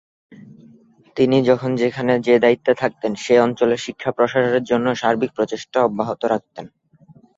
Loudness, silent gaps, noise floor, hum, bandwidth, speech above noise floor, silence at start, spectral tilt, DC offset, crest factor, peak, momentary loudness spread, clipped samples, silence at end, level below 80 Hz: -19 LUFS; none; -50 dBFS; none; 7.8 kHz; 32 dB; 0.3 s; -6 dB/octave; under 0.1%; 18 dB; -2 dBFS; 9 LU; under 0.1%; 0.7 s; -60 dBFS